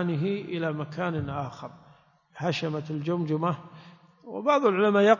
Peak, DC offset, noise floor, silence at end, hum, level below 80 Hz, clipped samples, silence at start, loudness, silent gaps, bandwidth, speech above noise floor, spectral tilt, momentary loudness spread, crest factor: -6 dBFS; under 0.1%; -59 dBFS; 0 s; none; -60 dBFS; under 0.1%; 0 s; -28 LUFS; none; 7.4 kHz; 33 dB; -7 dB/octave; 16 LU; 20 dB